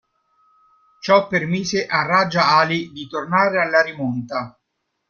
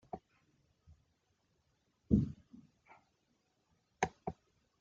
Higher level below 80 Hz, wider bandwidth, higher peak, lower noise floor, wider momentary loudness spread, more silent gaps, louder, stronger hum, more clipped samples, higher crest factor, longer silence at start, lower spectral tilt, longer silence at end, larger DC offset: about the same, -60 dBFS vs -56 dBFS; about the same, 7.2 kHz vs 7.4 kHz; first, -2 dBFS vs -16 dBFS; second, -75 dBFS vs -79 dBFS; second, 13 LU vs 21 LU; neither; first, -18 LUFS vs -38 LUFS; neither; neither; second, 18 dB vs 26 dB; first, 1.05 s vs 0.15 s; second, -5 dB/octave vs -7.5 dB/octave; about the same, 0.6 s vs 0.5 s; neither